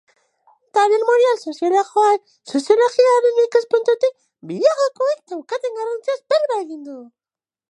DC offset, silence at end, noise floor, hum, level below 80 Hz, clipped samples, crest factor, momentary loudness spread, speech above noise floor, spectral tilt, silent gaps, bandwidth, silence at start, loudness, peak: under 0.1%; 0.65 s; under -90 dBFS; none; -82 dBFS; under 0.1%; 16 dB; 12 LU; over 73 dB; -3.5 dB/octave; none; 11 kHz; 0.75 s; -18 LUFS; -2 dBFS